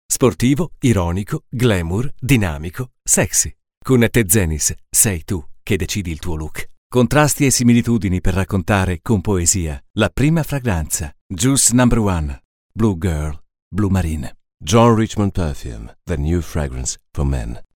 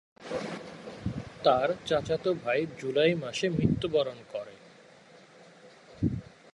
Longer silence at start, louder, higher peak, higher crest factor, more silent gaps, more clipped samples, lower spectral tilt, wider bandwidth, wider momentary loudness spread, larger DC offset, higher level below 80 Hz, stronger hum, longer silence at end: about the same, 0.1 s vs 0.2 s; first, -17 LUFS vs -30 LUFS; first, 0 dBFS vs -10 dBFS; about the same, 18 dB vs 22 dB; first, 3.77-3.81 s, 6.78-6.90 s, 9.90-9.94 s, 11.21-11.30 s, 12.45-12.69 s, 13.62-13.71 s vs none; neither; second, -4.5 dB/octave vs -6 dB/octave; first, 19.5 kHz vs 11.5 kHz; about the same, 13 LU vs 14 LU; neither; first, -32 dBFS vs -54 dBFS; neither; second, 0.1 s vs 0.3 s